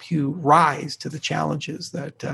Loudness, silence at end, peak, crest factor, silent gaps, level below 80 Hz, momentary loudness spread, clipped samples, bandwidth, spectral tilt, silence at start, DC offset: -22 LUFS; 0 s; -2 dBFS; 20 dB; none; -64 dBFS; 14 LU; under 0.1%; 12.5 kHz; -5.5 dB/octave; 0 s; under 0.1%